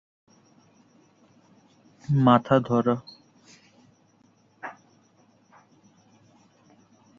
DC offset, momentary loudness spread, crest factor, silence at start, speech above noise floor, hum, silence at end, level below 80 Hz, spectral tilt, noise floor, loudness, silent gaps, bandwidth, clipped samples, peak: under 0.1%; 23 LU; 24 dB; 2.1 s; 41 dB; none; 2.5 s; -64 dBFS; -8.5 dB/octave; -62 dBFS; -22 LUFS; none; 7.2 kHz; under 0.1%; -6 dBFS